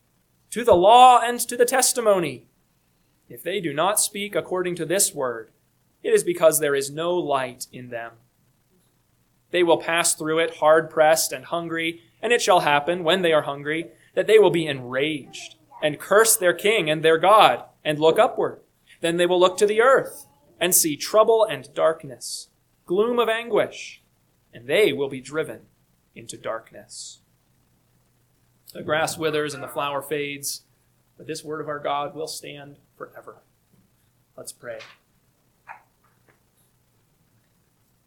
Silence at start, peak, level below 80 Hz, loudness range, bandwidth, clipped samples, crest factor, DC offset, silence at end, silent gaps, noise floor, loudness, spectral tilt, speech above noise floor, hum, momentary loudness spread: 0.5 s; 0 dBFS; -64 dBFS; 14 LU; 19 kHz; under 0.1%; 22 dB; under 0.1%; 2.35 s; none; -65 dBFS; -21 LUFS; -2.5 dB/octave; 44 dB; none; 20 LU